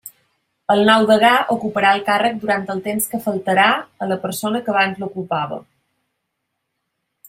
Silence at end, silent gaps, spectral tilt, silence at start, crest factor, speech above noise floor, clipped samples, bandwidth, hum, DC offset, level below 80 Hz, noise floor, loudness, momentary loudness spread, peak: 1.65 s; none; -4 dB/octave; 0.05 s; 18 dB; 58 dB; under 0.1%; 16 kHz; none; under 0.1%; -64 dBFS; -75 dBFS; -17 LUFS; 11 LU; 0 dBFS